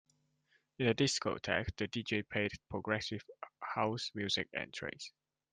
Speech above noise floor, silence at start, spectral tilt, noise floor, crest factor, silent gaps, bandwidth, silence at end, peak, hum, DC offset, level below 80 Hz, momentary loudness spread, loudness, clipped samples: 39 dB; 0.8 s; -4 dB/octave; -76 dBFS; 22 dB; none; 10 kHz; 0.45 s; -18 dBFS; none; under 0.1%; -64 dBFS; 13 LU; -37 LUFS; under 0.1%